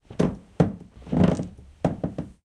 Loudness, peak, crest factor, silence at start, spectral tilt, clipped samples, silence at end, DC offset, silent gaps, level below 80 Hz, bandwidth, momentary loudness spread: -26 LUFS; -4 dBFS; 22 dB; 0.1 s; -8.5 dB/octave; under 0.1%; 0.15 s; under 0.1%; none; -44 dBFS; 9.8 kHz; 11 LU